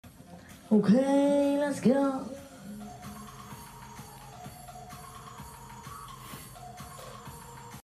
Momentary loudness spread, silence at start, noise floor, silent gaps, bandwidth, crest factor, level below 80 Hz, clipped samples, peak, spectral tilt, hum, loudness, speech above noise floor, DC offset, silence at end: 22 LU; 0.05 s; -50 dBFS; none; 15 kHz; 18 dB; -60 dBFS; under 0.1%; -14 dBFS; -6.5 dB/octave; none; -26 LUFS; 25 dB; under 0.1%; 0.1 s